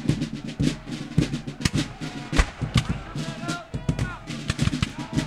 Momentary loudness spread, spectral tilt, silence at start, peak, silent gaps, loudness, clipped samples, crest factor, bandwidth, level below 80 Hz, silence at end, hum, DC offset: 7 LU; -5.5 dB/octave; 0 s; -4 dBFS; none; -28 LUFS; under 0.1%; 24 dB; 14 kHz; -34 dBFS; 0 s; none; under 0.1%